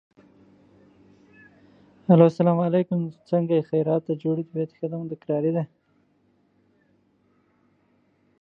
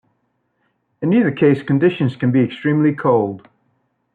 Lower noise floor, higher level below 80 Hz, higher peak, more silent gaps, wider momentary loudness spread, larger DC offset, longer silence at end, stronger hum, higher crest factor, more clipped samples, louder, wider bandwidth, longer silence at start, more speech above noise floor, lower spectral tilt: about the same, -65 dBFS vs -68 dBFS; second, -72 dBFS vs -62 dBFS; about the same, -2 dBFS vs -4 dBFS; neither; first, 14 LU vs 6 LU; neither; first, 2.75 s vs 0.75 s; second, none vs 60 Hz at -40 dBFS; first, 24 dB vs 14 dB; neither; second, -23 LUFS vs -17 LUFS; first, 5.6 kHz vs 4.6 kHz; first, 2.1 s vs 1 s; second, 43 dB vs 52 dB; about the same, -10.5 dB/octave vs -10 dB/octave